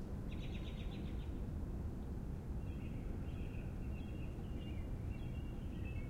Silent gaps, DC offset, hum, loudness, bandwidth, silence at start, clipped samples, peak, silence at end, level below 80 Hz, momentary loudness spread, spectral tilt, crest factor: none; under 0.1%; none; -46 LUFS; 16 kHz; 0 s; under 0.1%; -32 dBFS; 0 s; -46 dBFS; 1 LU; -8 dB/octave; 12 dB